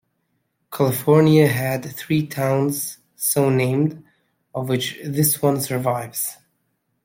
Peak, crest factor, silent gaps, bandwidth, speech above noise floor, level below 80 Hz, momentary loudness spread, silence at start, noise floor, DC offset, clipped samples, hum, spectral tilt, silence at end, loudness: -4 dBFS; 18 dB; none; 16.5 kHz; 52 dB; -60 dBFS; 12 LU; 0.7 s; -71 dBFS; under 0.1%; under 0.1%; none; -5.5 dB/octave; 0.7 s; -20 LUFS